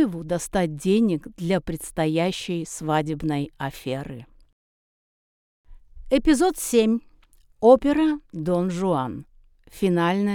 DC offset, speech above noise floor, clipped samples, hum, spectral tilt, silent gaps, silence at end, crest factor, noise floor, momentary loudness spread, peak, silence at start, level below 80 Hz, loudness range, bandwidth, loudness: under 0.1%; 33 dB; under 0.1%; none; -6 dB/octave; 4.53-5.64 s; 0 s; 20 dB; -55 dBFS; 12 LU; -4 dBFS; 0 s; -46 dBFS; 8 LU; 18.5 kHz; -23 LUFS